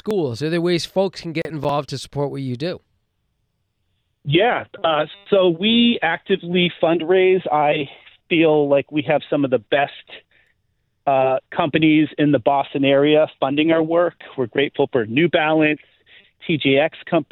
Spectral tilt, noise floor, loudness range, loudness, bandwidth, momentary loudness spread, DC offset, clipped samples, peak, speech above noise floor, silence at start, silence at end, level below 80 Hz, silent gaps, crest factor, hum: -6.5 dB/octave; -70 dBFS; 6 LU; -19 LUFS; 10 kHz; 10 LU; under 0.1%; under 0.1%; -4 dBFS; 52 dB; 0.05 s; 0.1 s; -58 dBFS; none; 16 dB; none